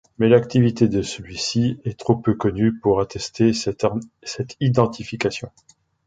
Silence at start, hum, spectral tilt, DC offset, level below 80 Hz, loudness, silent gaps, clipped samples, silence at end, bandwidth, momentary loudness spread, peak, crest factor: 0.2 s; none; -6 dB/octave; under 0.1%; -48 dBFS; -21 LUFS; none; under 0.1%; 0.6 s; 9.2 kHz; 13 LU; 0 dBFS; 20 dB